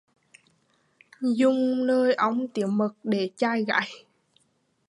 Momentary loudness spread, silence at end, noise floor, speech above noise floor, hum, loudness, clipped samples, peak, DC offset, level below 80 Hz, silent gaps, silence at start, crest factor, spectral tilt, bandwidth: 6 LU; 0.9 s; -70 dBFS; 46 dB; none; -25 LUFS; under 0.1%; -8 dBFS; under 0.1%; -80 dBFS; none; 1.2 s; 20 dB; -6 dB/octave; 11 kHz